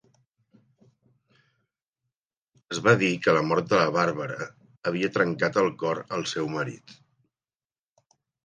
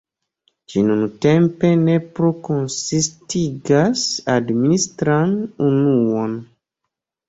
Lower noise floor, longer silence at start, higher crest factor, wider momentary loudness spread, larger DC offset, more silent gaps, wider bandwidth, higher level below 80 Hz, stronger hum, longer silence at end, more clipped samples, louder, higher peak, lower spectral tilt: first, under -90 dBFS vs -80 dBFS; first, 2.7 s vs 0.7 s; first, 22 dB vs 16 dB; first, 13 LU vs 7 LU; neither; first, 4.78-4.82 s vs none; first, 10 kHz vs 8 kHz; second, -68 dBFS vs -54 dBFS; neither; first, 1.55 s vs 0.85 s; neither; second, -25 LUFS vs -18 LUFS; second, -6 dBFS vs -2 dBFS; about the same, -5.5 dB/octave vs -5.5 dB/octave